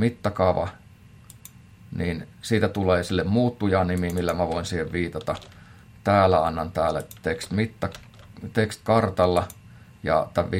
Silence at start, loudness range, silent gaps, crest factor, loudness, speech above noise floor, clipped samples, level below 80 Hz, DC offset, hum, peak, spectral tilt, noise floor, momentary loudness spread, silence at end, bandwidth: 0 s; 2 LU; none; 20 dB; -24 LUFS; 26 dB; under 0.1%; -52 dBFS; under 0.1%; none; -4 dBFS; -6.5 dB/octave; -49 dBFS; 12 LU; 0 s; 16.5 kHz